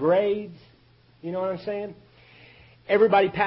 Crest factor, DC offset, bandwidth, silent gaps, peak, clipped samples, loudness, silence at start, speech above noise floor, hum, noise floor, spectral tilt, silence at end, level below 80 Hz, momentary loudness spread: 18 dB; under 0.1%; 5.8 kHz; none; -8 dBFS; under 0.1%; -24 LUFS; 0 s; 34 dB; none; -57 dBFS; -10 dB/octave; 0 s; -62 dBFS; 20 LU